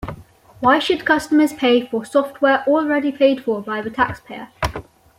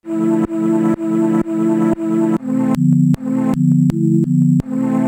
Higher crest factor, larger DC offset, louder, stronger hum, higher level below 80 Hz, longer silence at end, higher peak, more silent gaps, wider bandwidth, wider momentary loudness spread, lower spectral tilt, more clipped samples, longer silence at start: about the same, 16 dB vs 12 dB; neither; second, -18 LUFS vs -15 LUFS; neither; about the same, -44 dBFS vs -46 dBFS; first, 0.4 s vs 0 s; about the same, -2 dBFS vs -4 dBFS; neither; about the same, 16.5 kHz vs 16 kHz; first, 10 LU vs 4 LU; second, -5 dB/octave vs -9.5 dB/octave; neither; about the same, 0 s vs 0.05 s